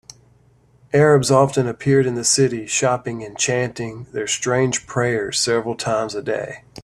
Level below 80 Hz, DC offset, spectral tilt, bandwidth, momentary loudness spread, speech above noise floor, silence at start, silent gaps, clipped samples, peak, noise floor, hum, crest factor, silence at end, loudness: -54 dBFS; under 0.1%; -4 dB/octave; 13 kHz; 11 LU; 36 dB; 0.95 s; none; under 0.1%; -2 dBFS; -55 dBFS; none; 18 dB; 0 s; -19 LUFS